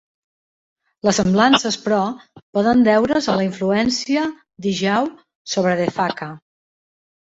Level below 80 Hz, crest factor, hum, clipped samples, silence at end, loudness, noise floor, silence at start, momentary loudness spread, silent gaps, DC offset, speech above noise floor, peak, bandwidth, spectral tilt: -54 dBFS; 18 dB; none; under 0.1%; 0.85 s; -18 LUFS; under -90 dBFS; 1.05 s; 12 LU; 2.42-2.53 s, 5.35-5.45 s; under 0.1%; over 72 dB; -2 dBFS; 8 kHz; -4.5 dB/octave